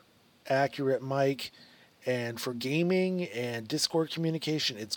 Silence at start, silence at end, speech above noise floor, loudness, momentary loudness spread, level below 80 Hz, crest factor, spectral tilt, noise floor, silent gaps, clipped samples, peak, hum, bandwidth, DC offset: 0.45 s; 0 s; 24 dB; -30 LUFS; 7 LU; -78 dBFS; 18 dB; -4.5 dB/octave; -54 dBFS; none; under 0.1%; -14 dBFS; none; 19 kHz; under 0.1%